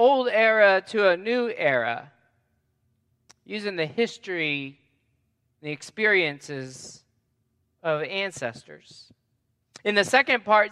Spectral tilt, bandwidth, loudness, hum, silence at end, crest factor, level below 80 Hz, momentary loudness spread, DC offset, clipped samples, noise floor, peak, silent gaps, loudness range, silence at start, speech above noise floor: -4 dB/octave; 12.5 kHz; -23 LUFS; none; 0 s; 22 dB; -76 dBFS; 17 LU; under 0.1%; under 0.1%; -73 dBFS; -4 dBFS; none; 8 LU; 0 s; 49 dB